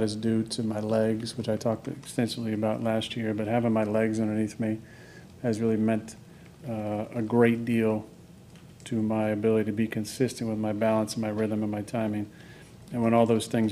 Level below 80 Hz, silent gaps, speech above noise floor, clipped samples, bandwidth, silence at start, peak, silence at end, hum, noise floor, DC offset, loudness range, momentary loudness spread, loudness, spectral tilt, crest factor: -62 dBFS; none; 23 dB; under 0.1%; 14 kHz; 0 s; -10 dBFS; 0 s; none; -50 dBFS; under 0.1%; 2 LU; 13 LU; -28 LUFS; -6.5 dB/octave; 18 dB